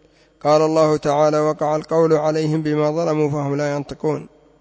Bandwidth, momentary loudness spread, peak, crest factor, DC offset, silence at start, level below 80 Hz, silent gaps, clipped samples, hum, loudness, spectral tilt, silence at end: 8 kHz; 8 LU; -4 dBFS; 14 dB; under 0.1%; 0.45 s; -56 dBFS; none; under 0.1%; none; -19 LUFS; -7 dB/octave; 0.35 s